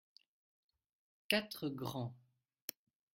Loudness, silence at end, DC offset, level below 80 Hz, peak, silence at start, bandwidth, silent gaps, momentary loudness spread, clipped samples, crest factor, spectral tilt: -41 LUFS; 0.95 s; under 0.1%; -80 dBFS; -16 dBFS; 1.3 s; 16 kHz; none; 13 LU; under 0.1%; 30 dB; -4 dB/octave